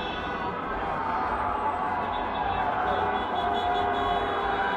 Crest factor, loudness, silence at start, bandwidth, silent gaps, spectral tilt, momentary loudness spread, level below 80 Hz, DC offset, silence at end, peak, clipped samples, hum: 12 dB; -28 LUFS; 0 s; 9.4 kHz; none; -6 dB/octave; 5 LU; -46 dBFS; under 0.1%; 0 s; -16 dBFS; under 0.1%; none